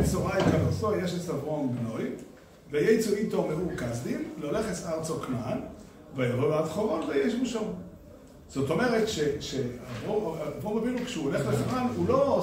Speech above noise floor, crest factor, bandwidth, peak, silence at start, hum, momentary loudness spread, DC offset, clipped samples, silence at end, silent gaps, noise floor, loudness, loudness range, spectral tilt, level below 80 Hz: 21 dB; 18 dB; 16 kHz; -12 dBFS; 0 s; none; 10 LU; under 0.1%; under 0.1%; 0 s; none; -49 dBFS; -29 LUFS; 2 LU; -6 dB/octave; -50 dBFS